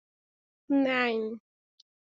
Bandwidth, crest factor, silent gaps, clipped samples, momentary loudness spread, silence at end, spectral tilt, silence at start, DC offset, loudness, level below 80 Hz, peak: 7.2 kHz; 20 dB; none; under 0.1%; 13 LU; 0.8 s; -2 dB/octave; 0.7 s; under 0.1%; -28 LUFS; -80 dBFS; -12 dBFS